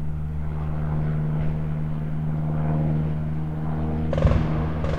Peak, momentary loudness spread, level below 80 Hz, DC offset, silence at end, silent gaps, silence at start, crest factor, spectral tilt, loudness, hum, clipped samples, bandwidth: -6 dBFS; 7 LU; -30 dBFS; 2%; 0 s; none; 0 s; 18 dB; -9.5 dB/octave; -26 LUFS; none; under 0.1%; 5 kHz